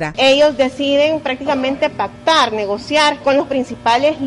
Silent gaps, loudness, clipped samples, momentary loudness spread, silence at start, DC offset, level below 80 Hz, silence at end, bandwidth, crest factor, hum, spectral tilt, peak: none; -15 LUFS; under 0.1%; 7 LU; 0 s; under 0.1%; -48 dBFS; 0 s; 11.5 kHz; 12 dB; none; -3.5 dB/octave; -2 dBFS